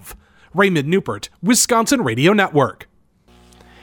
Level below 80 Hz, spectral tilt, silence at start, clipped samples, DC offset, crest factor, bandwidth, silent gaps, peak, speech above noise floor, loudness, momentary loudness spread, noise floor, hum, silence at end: -52 dBFS; -4 dB/octave; 0.05 s; under 0.1%; under 0.1%; 16 dB; over 20 kHz; none; -2 dBFS; 37 dB; -16 LUFS; 9 LU; -53 dBFS; none; 1 s